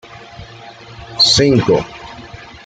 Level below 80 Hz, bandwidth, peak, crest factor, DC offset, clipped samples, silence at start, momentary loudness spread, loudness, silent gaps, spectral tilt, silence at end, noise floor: -42 dBFS; 9.4 kHz; 0 dBFS; 18 dB; under 0.1%; under 0.1%; 0.15 s; 26 LU; -11 LUFS; none; -4 dB/octave; 0.2 s; -36 dBFS